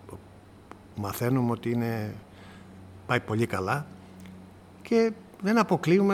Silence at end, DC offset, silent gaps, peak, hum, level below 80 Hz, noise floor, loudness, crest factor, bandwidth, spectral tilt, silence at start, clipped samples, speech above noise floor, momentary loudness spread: 0 s; under 0.1%; none; -8 dBFS; none; -62 dBFS; -51 dBFS; -28 LUFS; 20 dB; 16 kHz; -7 dB/octave; 0.05 s; under 0.1%; 25 dB; 24 LU